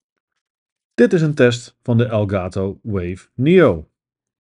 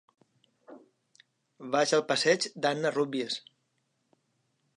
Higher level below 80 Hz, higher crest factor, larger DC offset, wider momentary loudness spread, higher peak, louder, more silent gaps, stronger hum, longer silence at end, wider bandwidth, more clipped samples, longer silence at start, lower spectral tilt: first, -48 dBFS vs -86 dBFS; about the same, 18 dB vs 22 dB; neither; first, 13 LU vs 10 LU; first, 0 dBFS vs -12 dBFS; first, -17 LUFS vs -28 LUFS; neither; neither; second, 0.6 s vs 1.35 s; about the same, 10.5 kHz vs 11.5 kHz; neither; first, 1 s vs 0.7 s; first, -7.5 dB/octave vs -3 dB/octave